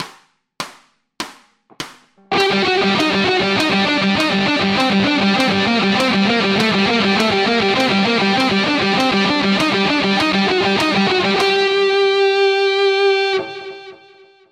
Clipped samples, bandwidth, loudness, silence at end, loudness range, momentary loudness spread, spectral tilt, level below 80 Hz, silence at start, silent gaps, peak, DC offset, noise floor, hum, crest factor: under 0.1%; 13.5 kHz; -15 LUFS; 0.55 s; 2 LU; 15 LU; -4.5 dB/octave; -52 dBFS; 0 s; none; -2 dBFS; under 0.1%; -50 dBFS; none; 14 dB